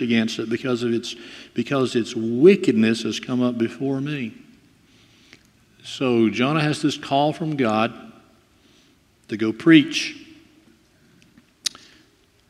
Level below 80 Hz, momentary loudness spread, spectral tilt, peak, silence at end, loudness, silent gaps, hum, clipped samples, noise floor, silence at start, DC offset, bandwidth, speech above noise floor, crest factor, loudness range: -66 dBFS; 16 LU; -5.5 dB/octave; 0 dBFS; 0.8 s; -21 LUFS; none; none; under 0.1%; -58 dBFS; 0 s; under 0.1%; 13 kHz; 37 dB; 22 dB; 4 LU